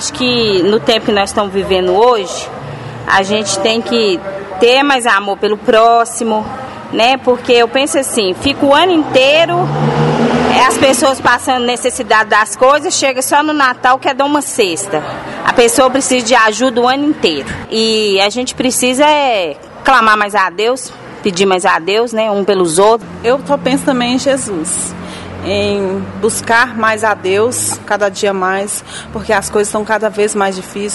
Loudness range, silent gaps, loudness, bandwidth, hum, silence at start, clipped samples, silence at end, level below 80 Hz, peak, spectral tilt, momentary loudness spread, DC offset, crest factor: 4 LU; none; -12 LUFS; 12 kHz; none; 0 s; 0.2%; 0 s; -44 dBFS; 0 dBFS; -3 dB/octave; 9 LU; under 0.1%; 12 dB